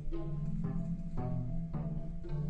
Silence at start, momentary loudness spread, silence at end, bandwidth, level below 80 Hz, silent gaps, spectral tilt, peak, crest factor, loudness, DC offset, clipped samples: 0 s; 3 LU; 0 s; 4.3 kHz; -40 dBFS; none; -10.5 dB/octave; -24 dBFS; 10 dB; -39 LUFS; under 0.1%; under 0.1%